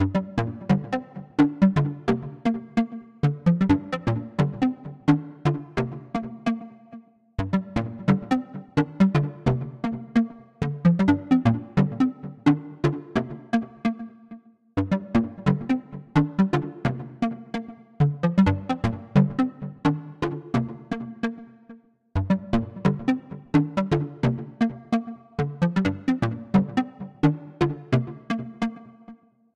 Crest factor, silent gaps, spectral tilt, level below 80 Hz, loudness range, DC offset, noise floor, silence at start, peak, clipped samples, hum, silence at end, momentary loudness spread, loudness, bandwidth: 18 dB; none; -8.5 dB/octave; -48 dBFS; 4 LU; under 0.1%; -49 dBFS; 0 s; -8 dBFS; under 0.1%; none; 0.4 s; 10 LU; -25 LUFS; 8.6 kHz